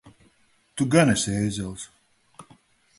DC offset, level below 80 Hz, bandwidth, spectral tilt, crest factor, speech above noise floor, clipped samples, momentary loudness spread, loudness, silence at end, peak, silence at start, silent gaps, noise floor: under 0.1%; -52 dBFS; 11.5 kHz; -5 dB/octave; 22 dB; 41 dB; under 0.1%; 20 LU; -23 LUFS; 0.55 s; -6 dBFS; 0.05 s; none; -63 dBFS